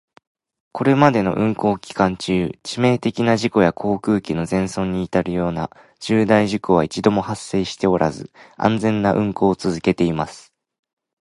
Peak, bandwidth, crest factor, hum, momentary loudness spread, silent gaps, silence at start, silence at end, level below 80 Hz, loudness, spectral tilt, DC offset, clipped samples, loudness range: 0 dBFS; 11.5 kHz; 20 dB; none; 8 LU; none; 0.75 s; 0.8 s; -46 dBFS; -19 LUFS; -6.5 dB/octave; under 0.1%; under 0.1%; 2 LU